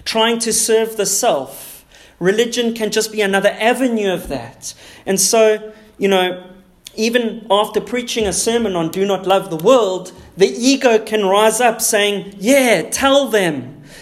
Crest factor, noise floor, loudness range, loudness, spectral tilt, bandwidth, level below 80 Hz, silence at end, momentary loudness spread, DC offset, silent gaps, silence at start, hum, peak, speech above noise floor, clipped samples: 16 dB; -42 dBFS; 4 LU; -15 LUFS; -3 dB/octave; 16 kHz; -50 dBFS; 0 s; 13 LU; under 0.1%; none; 0.05 s; none; 0 dBFS; 26 dB; under 0.1%